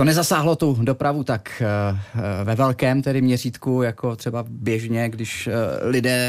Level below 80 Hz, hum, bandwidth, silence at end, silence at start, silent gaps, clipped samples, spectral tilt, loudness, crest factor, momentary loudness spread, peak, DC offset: -56 dBFS; none; 15.5 kHz; 0 s; 0 s; none; under 0.1%; -5.5 dB/octave; -22 LUFS; 14 dB; 7 LU; -6 dBFS; under 0.1%